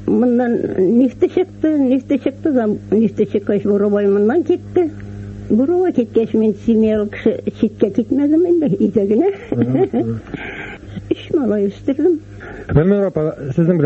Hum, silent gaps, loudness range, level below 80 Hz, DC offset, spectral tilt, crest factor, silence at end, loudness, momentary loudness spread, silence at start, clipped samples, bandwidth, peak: none; none; 3 LU; -42 dBFS; under 0.1%; -9.5 dB/octave; 14 dB; 0 s; -16 LUFS; 9 LU; 0 s; under 0.1%; 7.4 kHz; 0 dBFS